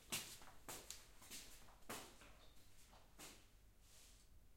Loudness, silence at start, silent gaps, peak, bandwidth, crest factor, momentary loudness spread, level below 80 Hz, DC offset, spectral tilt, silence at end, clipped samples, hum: -56 LUFS; 0 s; none; -30 dBFS; 16.5 kHz; 28 dB; 14 LU; -70 dBFS; under 0.1%; -1.5 dB/octave; 0 s; under 0.1%; none